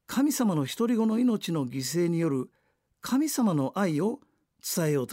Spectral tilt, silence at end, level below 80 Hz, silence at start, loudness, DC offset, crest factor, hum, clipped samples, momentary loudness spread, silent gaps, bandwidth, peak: -5.5 dB/octave; 0 s; -72 dBFS; 0.1 s; -27 LUFS; under 0.1%; 12 dB; none; under 0.1%; 8 LU; none; 16 kHz; -14 dBFS